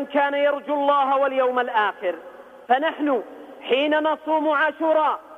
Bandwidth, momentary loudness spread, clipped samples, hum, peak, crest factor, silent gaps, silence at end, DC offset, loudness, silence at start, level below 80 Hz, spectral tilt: 5.6 kHz; 8 LU; under 0.1%; none; -6 dBFS; 16 dB; none; 0 s; under 0.1%; -21 LUFS; 0 s; -74 dBFS; -4.5 dB/octave